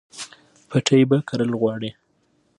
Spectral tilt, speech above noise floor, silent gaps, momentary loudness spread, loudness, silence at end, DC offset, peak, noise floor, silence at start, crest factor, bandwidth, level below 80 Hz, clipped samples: -6 dB/octave; 45 dB; none; 19 LU; -20 LUFS; 0.65 s; under 0.1%; -4 dBFS; -65 dBFS; 0.15 s; 18 dB; 11.5 kHz; -66 dBFS; under 0.1%